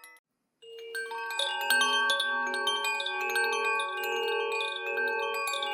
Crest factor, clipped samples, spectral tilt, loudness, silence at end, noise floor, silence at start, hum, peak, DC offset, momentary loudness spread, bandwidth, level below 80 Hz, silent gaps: 20 dB; under 0.1%; 2 dB/octave; -28 LUFS; 0 s; -53 dBFS; 0.05 s; none; -10 dBFS; under 0.1%; 9 LU; 19 kHz; under -90 dBFS; 0.19-0.24 s